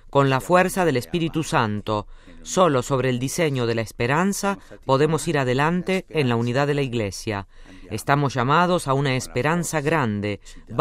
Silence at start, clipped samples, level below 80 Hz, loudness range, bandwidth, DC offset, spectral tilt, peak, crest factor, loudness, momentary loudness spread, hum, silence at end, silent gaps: 0.05 s; under 0.1%; -44 dBFS; 1 LU; 16 kHz; under 0.1%; -5.5 dB/octave; -2 dBFS; 18 dB; -22 LUFS; 9 LU; none; 0 s; none